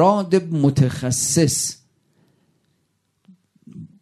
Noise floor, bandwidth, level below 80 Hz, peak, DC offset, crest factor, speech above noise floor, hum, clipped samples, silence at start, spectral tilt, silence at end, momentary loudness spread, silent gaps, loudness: -69 dBFS; 14 kHz; -54 dBFS; -2 dBFS; under 0.1%; 18 dB; 51 dB; none; under 0.1%; 0 s; -5 dB/octave; 0.15 s; 24 LU; none; -19 LUFS